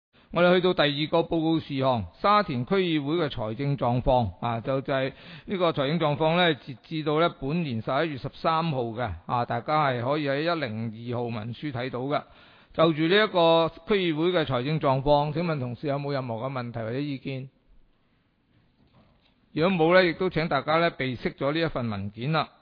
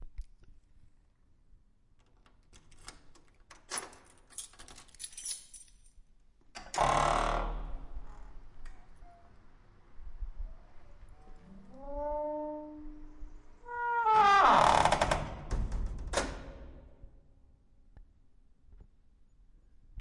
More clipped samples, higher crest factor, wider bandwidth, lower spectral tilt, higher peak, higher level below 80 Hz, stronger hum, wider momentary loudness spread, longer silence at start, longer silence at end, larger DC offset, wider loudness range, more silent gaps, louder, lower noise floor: neither; second, 18 dB vs 26 dB; second, 5.2 kHz vs 11.5 kHz; first, -9 dB/octave vs -3.5 dB/octave; about the same, -8 dBFS vs -10 dBFS; about the same, -50 dBFS vs -46 dBFS; neither; second, 11 LU vs 28 LU; first, 0.3 s vs 0 s; first, 0.15 s vs 0 s; neither; second, 5 LU vs 22 LU; neither; first, -26 LUFS vs -30 LUFS; about the same, -67 dBFS vs -64 dBFS